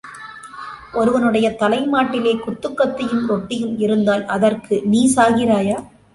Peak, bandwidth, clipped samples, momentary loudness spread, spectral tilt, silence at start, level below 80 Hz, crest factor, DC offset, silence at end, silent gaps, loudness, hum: -2 dBFS; 11.5 kHz; under 0.1%; 14 LU; -5 dB/octave; 0.05 s; -52 dBFS; 16 dB; under 0.1%; 0.3 s; none; -18 LUFS; none